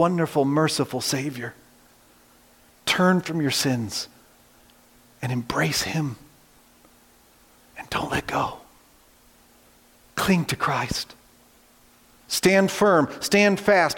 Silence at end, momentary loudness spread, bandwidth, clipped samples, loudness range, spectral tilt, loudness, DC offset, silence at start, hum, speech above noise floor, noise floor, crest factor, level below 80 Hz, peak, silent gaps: 0 s; 15 LU; 17 kHz; under 0.1%; 9 LU; -4.5 dB/octave; -23 LUFS; under 0.1%; 0 s; none; 34 dB; -56 dBFS; 18 dB; -54 dBFS; -6 dBFS; none